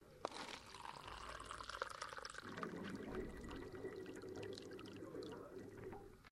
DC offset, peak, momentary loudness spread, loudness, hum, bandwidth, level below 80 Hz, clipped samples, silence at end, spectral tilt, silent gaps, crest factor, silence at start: under 0.1%; -24 dBFS; 6 LU; -51 LUFS; none; 16 kHz; -64 dBFS; under 0.1%; 0 s; -4.5 dB/octave; none; 28 dB; 0 s